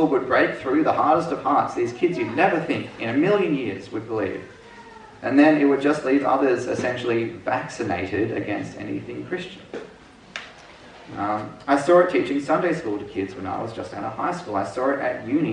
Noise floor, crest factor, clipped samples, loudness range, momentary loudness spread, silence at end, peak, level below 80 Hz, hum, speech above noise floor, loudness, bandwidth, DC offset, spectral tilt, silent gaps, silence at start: -46 dBFS; 18 dB; under 0.1%; 8 LU; 14 LU; 0 s; -4 dBFS; -60 dBFS; none; 24 dB; -23 LUFS; 10 kHz; under 0.1%; -6.5 dB/octave; none; 0 s